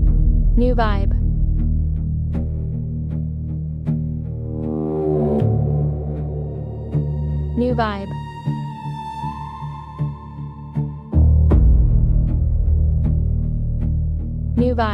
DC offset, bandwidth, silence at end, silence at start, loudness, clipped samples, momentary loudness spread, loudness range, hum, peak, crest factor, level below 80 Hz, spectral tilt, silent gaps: under 0.1%; 5 kHz; 0 s; 0 s; -21 LUFS; under 0.1%; 11 LU; 6 LU; none; -4 dBFS; 14 dB; -20 dBFS; -10 dB/octave; none